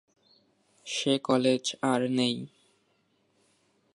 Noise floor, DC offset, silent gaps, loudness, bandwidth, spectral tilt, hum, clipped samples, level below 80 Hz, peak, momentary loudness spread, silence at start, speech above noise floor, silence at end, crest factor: -71 dBFS; under 0.1%; none; -28 LUFS; 11.5 kHz; -4.5 dB/octave; none; under 0.1%; -82 dBFS; -10 dBFS; 13 LU; 0.85 s; 44 dB; 1.5 s; 20 dB